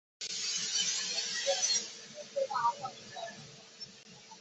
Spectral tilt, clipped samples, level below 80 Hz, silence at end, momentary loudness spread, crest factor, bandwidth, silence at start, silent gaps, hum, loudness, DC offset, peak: 0.5 dB/octave; under 0.1%; -82 dBFS; 0 s; 18 LU; 18 dB; 8.2 kHz; 0.2 s; none; none; -32 LUFS; under 0.1%; -18 dBFS